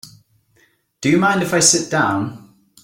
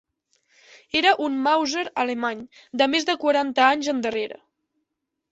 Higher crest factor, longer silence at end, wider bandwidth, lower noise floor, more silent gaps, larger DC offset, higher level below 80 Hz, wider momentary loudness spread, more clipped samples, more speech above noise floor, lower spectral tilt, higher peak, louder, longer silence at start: about the same, 18 dB vs 20 dB; second, 0.45 s vs 1 s; first, 16.5 kHz vs 8.2 kHz; second, -59 dBFS vs -80 dBFS; neither; neither; first, -56 dBFS vs -68 dBFS; about the same, 11 LU vs 10 LU; neither; second, 43 dB vs 58 dB; about the same, -3 dB/octave vs -2 dB/octave; first, 0 dBFS vs -4 dBFS; first, -16 LUFS vs -22 LUFS; second, 0.05 s vs 0.95 s